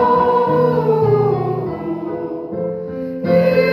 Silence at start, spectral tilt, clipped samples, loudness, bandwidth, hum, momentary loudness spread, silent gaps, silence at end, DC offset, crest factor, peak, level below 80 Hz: 0 s; -9.5 dB/octave; under 0.1%; -17 LUFS; 13 kHz; none; 11 LU; none; 0 s; under 0.1%; 14 dB; -4 dBFS; -50 dBFS